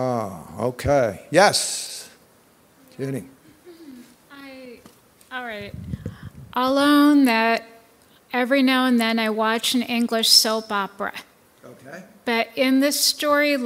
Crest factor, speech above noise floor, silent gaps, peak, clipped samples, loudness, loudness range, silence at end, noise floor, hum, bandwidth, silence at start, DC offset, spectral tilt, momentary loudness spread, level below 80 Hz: 20 dB; 36 dB; none; -2 dBFS; under 0.1%; -20 LUFS; 17 LU; 0 s; -56 dBFS; none; 16 kHz; 0 s; under 0.1%; -3 dB/octave; 21 LU; -54 dBFS